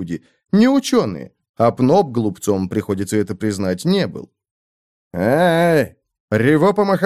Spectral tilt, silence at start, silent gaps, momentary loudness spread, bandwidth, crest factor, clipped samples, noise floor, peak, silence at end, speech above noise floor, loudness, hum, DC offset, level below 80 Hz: -6.5 dB/octave; 0 s; 1.49-1.54 s, 4.51-5.11 s, 6.20-6.28 s; 12 LU; 15 kHz; 16 dB; under 0.1%; under -90 dBFS; -2 dBFS; 0 s; over 73 dB; -17 LUFS; none; under 0.1%; -56 dBFS